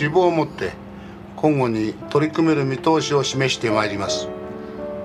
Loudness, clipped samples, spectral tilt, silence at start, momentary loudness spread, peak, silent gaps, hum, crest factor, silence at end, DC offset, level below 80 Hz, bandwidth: -21 LUFS; under 0.1%; -5 dB/octave; 0 s; 14 LU; -4 dBFS; none; none; 16 dB; 0 s; under 0.1%; -52 dBFS; 12 kHz